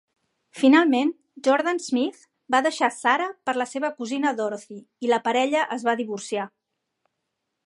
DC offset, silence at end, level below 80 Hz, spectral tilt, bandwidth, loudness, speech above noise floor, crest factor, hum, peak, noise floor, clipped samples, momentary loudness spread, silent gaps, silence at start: under 0.1%; 1.2 s; -82 dBFS; -3.5 dB/octave; 11.5 kHz; -23 LUFS; 57 dB; 18 dB; none; -6 dBFS; -80 dBFS; under 0.1%; 12 LU; none; 0.55 s